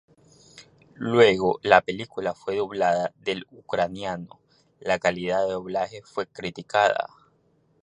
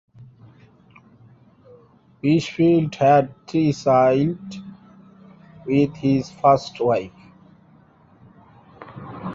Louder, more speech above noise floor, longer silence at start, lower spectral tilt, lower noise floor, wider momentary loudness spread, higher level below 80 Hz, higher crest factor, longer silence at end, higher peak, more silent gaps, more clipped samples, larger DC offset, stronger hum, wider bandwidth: second, -24 LUFS vs -19 LUFS; first, 41 dB vs 34 dB; first, 0.55 s vs 0.2 s; second, -5 dB/octave vs -7.5 dB/octave; first, -65 dBFS vs -53 dBFS; second, 15 LU vs 21 LU; about the same, -60 dBFS vs -58 dBFS; first, 24 dB vs 18 dB; first, 0.8 s vs 0 s; about the same, -2 dBFS vs -4 dBFS; neither; neither; neither; neither; first, 10 kHz vs 7.8 kHz